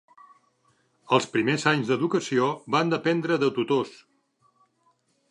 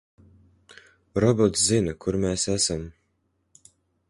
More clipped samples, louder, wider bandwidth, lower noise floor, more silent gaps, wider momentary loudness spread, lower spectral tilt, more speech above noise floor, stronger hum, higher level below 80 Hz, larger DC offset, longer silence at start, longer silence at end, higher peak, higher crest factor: neither; about the same, -24 LUFS vs -23 LUFS; about the same, 11 kHz vs 11.5 kHz; second, -68 dBFS vs -72 dBFS; neither; second, 3 LU vs 11 LU; about the same, -5.5 dB/octave vs -4.5 dB/octave; second, 44 dB vs 49 dB; neither; second, -74 dBFS vs -48 dBFS; neither; about the same, 1.1 s vs 1.15 s; first, 1.4 s vs 1.2 s; about the same, -4 dBFS vs -6 dBFS; about the same, 22 dB vs 20 dB